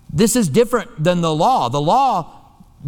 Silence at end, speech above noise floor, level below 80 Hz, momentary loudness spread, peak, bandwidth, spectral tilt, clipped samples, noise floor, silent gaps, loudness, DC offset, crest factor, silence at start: 0 s; 20 dB; -44 dBFS; 4 LU; -2 dBFS; 19 kHz; -5 dB/octave; under 0.1%; -36 dBFS; none; -16 LUFS; under 0.1%; 16 dB; 0.1 s